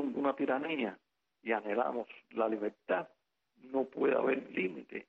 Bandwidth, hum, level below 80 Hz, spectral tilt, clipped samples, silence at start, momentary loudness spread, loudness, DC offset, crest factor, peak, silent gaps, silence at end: 5.4 kHz; none; -80 dBFS; -7.5 dB/octave; under 0.1%; 0 s; 8 LU; -35 LUFS; under 0.1%; 16 dB; -18 dBFS; none; 0.05 s